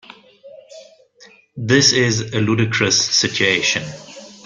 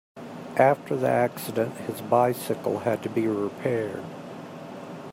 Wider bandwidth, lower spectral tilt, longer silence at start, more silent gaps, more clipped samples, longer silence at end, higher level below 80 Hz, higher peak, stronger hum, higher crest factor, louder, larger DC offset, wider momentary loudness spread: second, 11 kHz vs 16 kHz; second, -3 dB/octave vs -6.5 dB/octave; first, 0.45 s vs 0.15 s; neither; neither; about the same, 0.1 s vs 0 s; first, -54 dBFS vs -70 dBFS; first, 0 dBFS vs -6 dBFS; neither; about the same, 18 dB vs 22 dB; first, -15 LUFS vs -26 LUFS; neither; about the same, 18 LU vs 18 LU